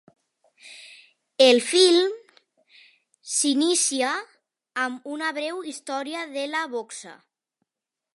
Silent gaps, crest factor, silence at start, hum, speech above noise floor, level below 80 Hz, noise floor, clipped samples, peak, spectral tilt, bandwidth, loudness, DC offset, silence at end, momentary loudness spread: none; 24 dB; 0.65 s; none; 64 dB; -86 dBFS; -87 dBFS; under 0.1%; -2 dBFS; -0.5 dB/octave; 11.5 kHz; -23 LUFS; under 0.1%; 1.05 s; 22 LU